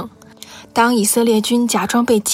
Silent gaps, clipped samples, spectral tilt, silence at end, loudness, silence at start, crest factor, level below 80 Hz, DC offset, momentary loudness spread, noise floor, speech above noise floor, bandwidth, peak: none; under 0.1%; -3.5 dB/octave; 0 s; -15 LUFS; 0 s; 14 dB; -56 dBFS; under 0.1%; 12 LU; -39 dBFS; 25 dB; 16.5 kHz; -2 dBFS